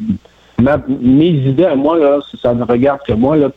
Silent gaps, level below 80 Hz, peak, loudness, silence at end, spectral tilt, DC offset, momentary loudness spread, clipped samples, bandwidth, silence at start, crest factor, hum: none; -38 dBFS; -2 dBFS; -13 LUFS; 0.05 s; -10 dB/octave; under 0.1%; 6 LU; under 0.1%; 4.6 kHz; 0 s; 10 dB; none